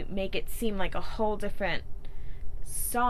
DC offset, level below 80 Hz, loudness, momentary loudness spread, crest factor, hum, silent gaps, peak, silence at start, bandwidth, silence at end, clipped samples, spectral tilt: under 0.1%; -36 dBFS; -33 LUFS; 15 LU; 12 dB; none; none; -14 dBFS; 0 s; 14 kHz; 0 s; under 0.1%; -4 dB/octave